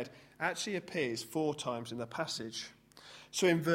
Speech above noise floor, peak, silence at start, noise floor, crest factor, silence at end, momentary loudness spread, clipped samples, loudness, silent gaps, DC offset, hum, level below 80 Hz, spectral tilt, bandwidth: 21 dB; -16 dBFS; 0 s; -56 dBFS; 20 dB; 0 s; 16 LU; under 0.1%; -36 LUFS; none; under 0.1%; none; -74 dBFS; -4 dB/octave; 16.5 kHz